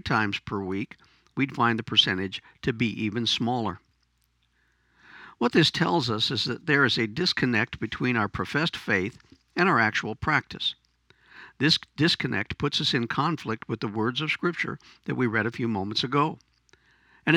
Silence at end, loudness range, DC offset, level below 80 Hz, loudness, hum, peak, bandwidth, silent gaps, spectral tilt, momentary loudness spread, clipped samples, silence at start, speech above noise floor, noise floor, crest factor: 0 s; 3 LU; under 0.1%; -56 dBFS; -26 LUFS; none; -4 dBFS; 15 kHz; none; -5 dB/octave; 11 LU; under 0.1%; 0.05 s; 44 dB; -70 dBFS; 22 dB